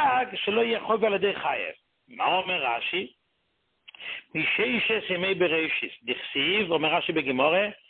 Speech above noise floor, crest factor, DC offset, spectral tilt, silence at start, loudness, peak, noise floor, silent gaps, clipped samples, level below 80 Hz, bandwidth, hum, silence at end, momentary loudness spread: 47 dB; 18 dB; under 0.1%; -8.5 dB/octave; 0 s; -25 LUFS; -8 dBFS; -74 dBFS; none; under 0.1%; -66 dBFS; 4.5 kHz; none; 0.15 s; 8 LU